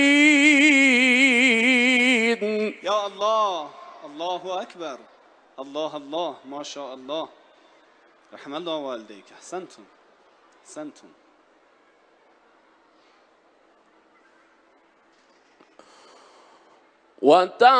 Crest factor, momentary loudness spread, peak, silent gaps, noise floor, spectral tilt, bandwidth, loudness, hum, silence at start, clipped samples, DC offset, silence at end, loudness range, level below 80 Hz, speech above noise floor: 20 dB; 24 LU; -4 dBFS; none; -59 dBFS; -2.5 dB/octave; 10 kHz; -19 LUFS; none; 0 s; under 0.1%; under 0.1%; 0 s; 20 LU; -78 dBFS; 35 dB